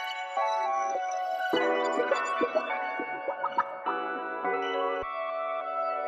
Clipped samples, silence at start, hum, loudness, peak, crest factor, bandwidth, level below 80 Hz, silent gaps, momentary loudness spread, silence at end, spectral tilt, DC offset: under 0.1%; 0 s; none; -30 LUFS; -14 dBFS; 16 dB; 12.5 kHz; -70 dBFS; none; 5 LU; 0 s; -2.5 dB/octave; under 0.1%